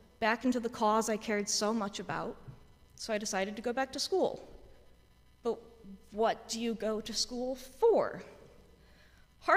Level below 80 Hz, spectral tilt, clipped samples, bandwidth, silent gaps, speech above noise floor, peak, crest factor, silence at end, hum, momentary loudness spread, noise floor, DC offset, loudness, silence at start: -62 dBFS; -3 dB/octave; under 0.1%; 15.5 kHz; none; 29 dB; -14 dBFS; 22 dB; 0 s; none; 15 LU; -62 dBFS; under 0.1%; -33 LUFS; 0.2 s